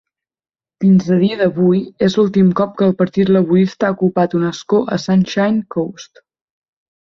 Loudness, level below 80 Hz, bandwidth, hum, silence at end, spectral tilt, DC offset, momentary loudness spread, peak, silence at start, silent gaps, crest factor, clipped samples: -15 LUFS; -54 dBFS; 7 kHz; none; 0.95 s; -7.5 dB/octave; under 0.1%; 5 LU; -2 dBFS; 0.8 s; none; 12 dB; under 0.1%